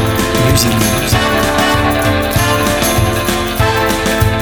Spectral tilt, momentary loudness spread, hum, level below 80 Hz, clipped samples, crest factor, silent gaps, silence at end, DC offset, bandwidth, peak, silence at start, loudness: -4.5 dB/octave; 3 LU; none; -24 dBFS; under 0.1%; 12 dB; none; 0 s; under 0.1%; 19.5 kHz; 0 dBFS; 0 s; -12 LUFS